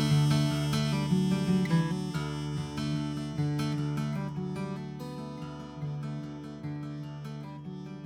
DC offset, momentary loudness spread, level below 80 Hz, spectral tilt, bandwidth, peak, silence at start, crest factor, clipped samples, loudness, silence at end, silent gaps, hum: under 0.1%; 14 LU; -54 dBFS; -6.5 dB/octave; 14 kHz; -14 dBFS; 0 s; 16 dB; under 0.1%; -32 LUFS; 0 s; none; none